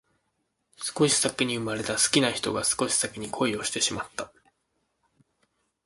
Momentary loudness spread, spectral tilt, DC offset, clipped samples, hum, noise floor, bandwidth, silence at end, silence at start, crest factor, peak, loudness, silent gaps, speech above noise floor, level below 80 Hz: 12 LU; -2.5 dB/octave; under 0.1%; under 0.1%; none; -76 dBFS; 12 kHz; 1.6 s; 0.8 s; 26 dB; -4 dBFS; -25 LUFS; none; 50 dB; -62 dBFS